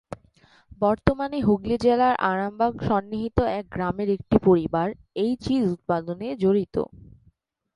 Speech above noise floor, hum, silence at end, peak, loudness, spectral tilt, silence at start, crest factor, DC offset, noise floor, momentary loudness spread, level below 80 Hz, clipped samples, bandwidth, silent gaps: 40 dB; none; 0.9 s; -2 dBFS; -24 LUFS; -8 dB/octave; 0.1 s; 22 dB; under 0.1%; -63 dBFS; 9 LU; -44 dBFS; under 0.1%; 11 kHz; none